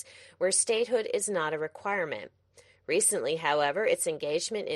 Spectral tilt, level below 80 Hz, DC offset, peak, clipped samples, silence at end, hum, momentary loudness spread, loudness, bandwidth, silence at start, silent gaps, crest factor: -2 dB/octave; -76 dBFS; under 0.1%; -12 dBFS; under 0.1%; 0 s; none; 9 LU; -28 LUFS; 12.5 kHz; 0.05 s; none; 18 dB